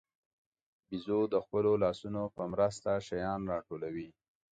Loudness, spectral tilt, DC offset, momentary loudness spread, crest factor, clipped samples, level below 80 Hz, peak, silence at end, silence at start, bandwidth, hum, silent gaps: -34 LUFS; -7 dB/octave; under 0.1%; 12 LU; 18 dB; under 0.1%; -62 dBFS; -16 dBFS; 0.4 s; 0.9 s; 9 kHz; none; none